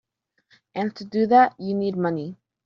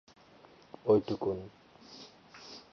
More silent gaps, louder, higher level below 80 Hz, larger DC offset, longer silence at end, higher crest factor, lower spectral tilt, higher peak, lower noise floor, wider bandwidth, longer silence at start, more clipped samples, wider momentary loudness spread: neither; first, -22 LUFS vs -31 LUFS; about the same, -70 dBFS vs -66 dBFS; neither; first, 0.3 s vs 0.1 s; about the same, 18 dB vs 22 dB; second, -5.5 dB/octave vs -7.5 dB/octave; first, -6 dBFS vs -14 dBFS; first, -66 dBFS vs -59 dBFS; about the same, 6.4 kHz vs 6.6 kHz; about the same, 0.75 s vs 0.85 s; neither; second, 15 LU vs 24 LU